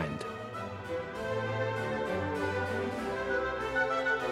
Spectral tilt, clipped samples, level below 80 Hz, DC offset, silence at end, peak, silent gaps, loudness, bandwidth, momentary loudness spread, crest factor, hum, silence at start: -6 dB/octave; under 0.1%; -56 dBFS; under 0.1%; 0 s; -16 dBFS; none; -33 LUFS; 15 kHz; 9 LU; 18 dB; none; 0 s